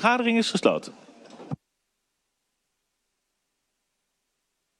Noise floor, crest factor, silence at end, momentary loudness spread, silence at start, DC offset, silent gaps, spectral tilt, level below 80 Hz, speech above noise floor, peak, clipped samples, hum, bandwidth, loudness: -79 dBFS; 24 dB; 3.25 s; 18 LU; 0 s; under 0.1%; none; -4.5 dB/octave; -76 dBFS; 55 dB; -6 dBFS; under 0.1%; none; 11.5 kHz; -23 LUFS